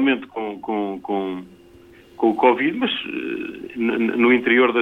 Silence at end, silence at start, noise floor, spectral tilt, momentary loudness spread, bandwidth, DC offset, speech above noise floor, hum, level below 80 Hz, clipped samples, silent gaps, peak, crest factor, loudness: 0 s; 0 s; -47 dBFS; -6.5 dB/octave; 13 LU; 5 kHz; under 0.1%; 27 dB; none; -62 dBFS; under 0.1%; none; -2 dBFS; 18 dB; -21 LUFS